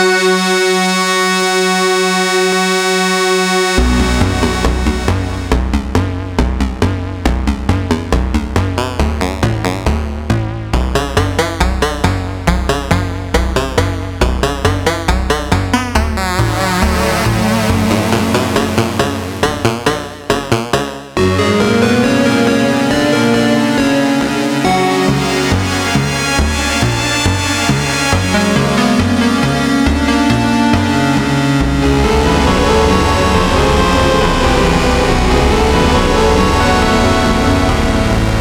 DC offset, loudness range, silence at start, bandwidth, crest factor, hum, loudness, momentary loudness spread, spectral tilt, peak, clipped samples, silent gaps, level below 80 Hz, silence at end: under 0.1%; 5 LU; 0 s; 19.5 kHz; 12 dB; none; -13 LUFS; 5 LU; -5 dB/octave; 0 dBFS; under 0.1%; none; -20 dBFS; 0 s